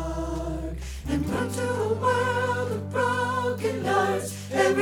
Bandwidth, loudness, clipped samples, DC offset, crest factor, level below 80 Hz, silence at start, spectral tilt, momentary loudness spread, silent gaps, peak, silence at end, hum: 18 kHz; -26 LUFS; under 0.1%; under 0.1%; 18 dB; -40 dBFS; 0 s; -5.5 dB/octave; 7 LU; none; -8 dBFS; 0 s; none